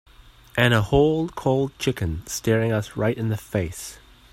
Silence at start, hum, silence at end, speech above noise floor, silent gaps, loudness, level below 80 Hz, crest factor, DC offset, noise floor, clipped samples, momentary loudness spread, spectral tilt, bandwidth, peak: 0.55 s; none; 0.4 s; 26 dB; none; -23 LUFS; -44 dBFS; 20 dB; under 0.1%; -48 dBFS; under 0.1%; 10 LU; -5.5 dB/octave; 16 kHz; -4 dBFS